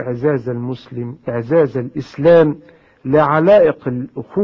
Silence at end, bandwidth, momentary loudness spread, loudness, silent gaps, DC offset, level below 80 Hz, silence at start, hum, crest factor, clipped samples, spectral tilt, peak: 0 s; 6.4 kHz; 15 LU; -15 LUFS; none; under 0.1%; -50 dBFS; 0 s; none; 14 dB; under 0.1%; -9 dB/octave; -2 dBFS